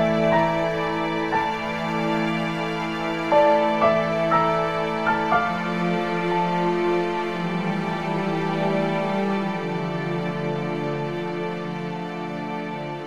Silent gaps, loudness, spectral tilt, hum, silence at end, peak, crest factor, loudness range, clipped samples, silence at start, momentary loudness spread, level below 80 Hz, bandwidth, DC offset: none; -23 LUFS; -7 dB/octave; none; 0 s; -6 dBFS; 18 dB; 5 LU; under 0.1%; 0 s; 9 LU; -54 dBFS; 12.5 kHz; 0.4%